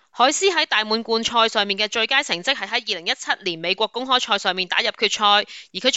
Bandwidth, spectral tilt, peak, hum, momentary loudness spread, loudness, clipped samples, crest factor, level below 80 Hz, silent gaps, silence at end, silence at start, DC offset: 9 kHz; -1 dB/octave; -2 dBFS; none; 6 LU; -19 LUFS; under 0.1%; 18 dB; -64 dBFS; none; 0 s; 0.15 s; under 0.1%